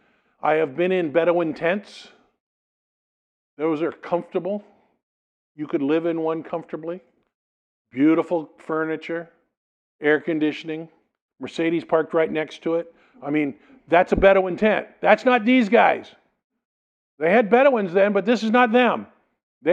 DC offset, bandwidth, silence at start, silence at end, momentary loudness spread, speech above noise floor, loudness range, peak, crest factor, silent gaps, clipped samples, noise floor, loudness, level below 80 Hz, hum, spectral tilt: under 0.1%; 8.6 kHz; 0.45 s; 0 s; 15 LU; over 69 dB; 9 LU; 0 dBFS; 22 dB; 2.40-3.57 s, 5.03-5.55 s, 7.34-7.85 s, 9.57-9.99 s, 11.21-11.29 s, 16.44-16.50 s, 16.65-17.18 s, 19.43-19.61 s; under 0.1%; under -90 dBFS; -21 LUFS; -52 dBFS; none; -6.5 dB/octave